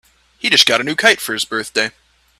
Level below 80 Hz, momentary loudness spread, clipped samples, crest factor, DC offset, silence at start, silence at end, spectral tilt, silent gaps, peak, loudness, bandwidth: -58 dBFS; 10 LU; under 0.1%; 18 dB; under 0.1%; 0.45 s; 0.5 s; -1 dB/octave; none; 0 dBFS; -14 LUFS; 16 kHz